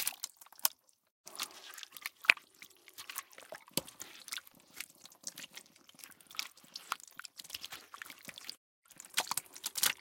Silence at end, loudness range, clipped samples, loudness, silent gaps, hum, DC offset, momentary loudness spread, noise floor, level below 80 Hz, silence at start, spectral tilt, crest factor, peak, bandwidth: 0 s; 10 LU; under 0.1%; -38 LUFS; 1.11-1.24 s, 8.57-8.82 s; none; under 0.1%; 21 LU; -59 dBFS; -82 dBFS; 0 s; 1 dB/octave; 40 dB; -2 dBFS; 17 kHz